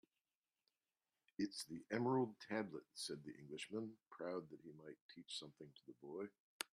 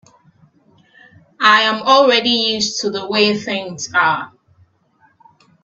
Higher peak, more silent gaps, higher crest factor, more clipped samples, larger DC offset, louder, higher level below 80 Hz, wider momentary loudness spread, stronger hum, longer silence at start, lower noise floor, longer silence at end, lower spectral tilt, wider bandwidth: second, -26 dBFS vs 0 dBFS; first, 5.01-5.09 s, 6.40-6.60 s vs none; about the same, 22 dB vs 18 dB; neither; neither; second, -47 LUFS vs -14 LUFS; second, -88 dBFS vs -64 dBFS; first, 18 LU vs 12 LU; neither; about the same, 1.4 s vs 1.4 s; first, under -90 dBFS vs -57 dBFS; second, 0.1 s vs 1.35 s; first, -4.5 dB/octave vs -2.5 dB/octave; first, 13.5 kHz vs 8.4 kHz